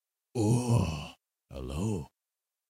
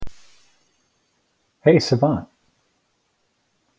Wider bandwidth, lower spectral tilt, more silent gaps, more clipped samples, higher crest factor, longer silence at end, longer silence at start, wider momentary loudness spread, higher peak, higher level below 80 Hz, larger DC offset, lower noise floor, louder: first, 14.5 kHz vs 8 kHz; about the same, -6.5 dB/octave vs -6.5 dB/octave; neither; neither; about the same, 18 dB vs 22 dB; second, 0.65 s vs 1.55 s; first, 0.35 s vs 0 s; first, 20 LU vs 13 LU; second, -14 dBFS vs -2 dBFS; about the same, -48 dBFS vs -50 dBFS; neither; first, under -90 dBFS vs -69 dBFS; second, -31 LUFS vs -19 LUFS